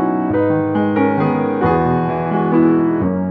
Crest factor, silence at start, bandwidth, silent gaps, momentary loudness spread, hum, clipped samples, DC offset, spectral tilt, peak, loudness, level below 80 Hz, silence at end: 14 dB; 0 s; 4.5 kHz; none; 4 LU; none; under 0.1%; under 0.1%; -11.5 dB/octave; 0 dBFS; -16 LUFS; -44 dBFS; 0 s